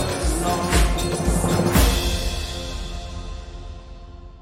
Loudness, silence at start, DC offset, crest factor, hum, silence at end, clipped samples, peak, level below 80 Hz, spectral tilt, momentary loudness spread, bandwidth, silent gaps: -22 LUFS; 0 s; under 0.1%; 18 dB; none; 0 s; under 0.1%; -4 dBFS; -26 dBFS; -4.5 dB/octave; 21 LU; 16.5 kHz; none